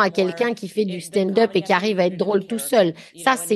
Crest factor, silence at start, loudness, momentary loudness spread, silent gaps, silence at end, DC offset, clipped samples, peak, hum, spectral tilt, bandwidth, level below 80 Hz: 18 dB; 0 s; -21 LUFS; 5 LU; none; 0 s; under 0.1%; under 0.1%; -2 dBFS; none; -4.5 dB/octave; 12.5 kHz; -68 dBFS